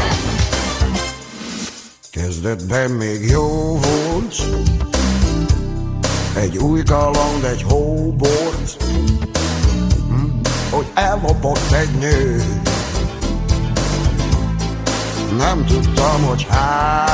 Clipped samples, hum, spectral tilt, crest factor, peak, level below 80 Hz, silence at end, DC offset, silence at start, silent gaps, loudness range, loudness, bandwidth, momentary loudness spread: under 0.1%; none; -5.5 dB/octave; 14 dB; -2 dBFS; -22 dBFS; 0 s; under 0.1%; 0 s; none; 2 LU; -18 LUFS; 8 kHz; 6 LU